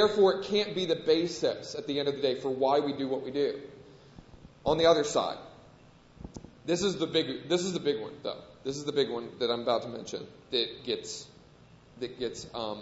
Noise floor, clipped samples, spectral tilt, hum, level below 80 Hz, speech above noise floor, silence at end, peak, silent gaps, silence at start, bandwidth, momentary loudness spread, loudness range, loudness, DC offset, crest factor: -56 dBFS; under 0.1%; -4.5 dB/octave; none; -60 dBFS; 27 dB; 0 s; -10 dBFS; none; 0 s; 8 kHz; 16 LU; 4 LU; -30 LUFS; under 0.1%; 20 dB